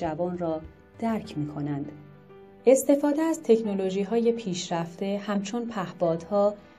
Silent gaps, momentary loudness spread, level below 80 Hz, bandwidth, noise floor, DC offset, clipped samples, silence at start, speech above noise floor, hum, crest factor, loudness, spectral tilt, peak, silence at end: none; 11 LU; -60 dBFS; 14.5 kHz; -50 dBFS; under 0.1%; under 0.1%; 0 s; 24 dB; none; 20 dB; -27 LUFS; -6 dB/octave; -6 dBFS; 0.2 s